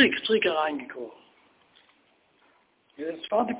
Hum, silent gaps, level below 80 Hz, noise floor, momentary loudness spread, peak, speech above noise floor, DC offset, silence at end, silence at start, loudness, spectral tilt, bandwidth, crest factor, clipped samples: none; none; -70 dBFS; -65 dBFS; 17 LU; -8 dBFS; 38 dB; under 0.1%; 0 s; 0 s; -27 LUFS; -1 dB/octave; 4 kHz; 22 dB; under 0.1%